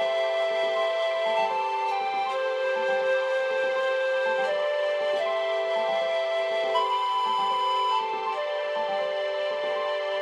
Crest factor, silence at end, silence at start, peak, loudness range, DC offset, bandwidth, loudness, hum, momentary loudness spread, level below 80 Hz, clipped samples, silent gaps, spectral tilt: 12 dB; 0 s; 0 s; -14 dBFS; 1 LU; under 0.1%; 11 kHz; -26 LUFS; none; 3 LU; -80 dBFS; under 0.1%; none; -2 dB/octave